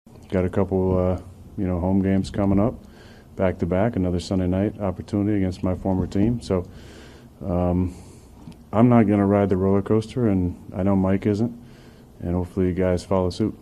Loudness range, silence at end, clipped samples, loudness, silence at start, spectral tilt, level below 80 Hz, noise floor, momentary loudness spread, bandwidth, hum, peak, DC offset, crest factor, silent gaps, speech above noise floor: 4 LU; 0.05 s; under 0.1%; -22 LUFS; 0.2 s; -8.5 dB/octave; -44 dBFS; -46 dBFS; 10 LU; 11 kHz; none; -4 dBFS; under 0.1%; 18 dB; none; 25 dB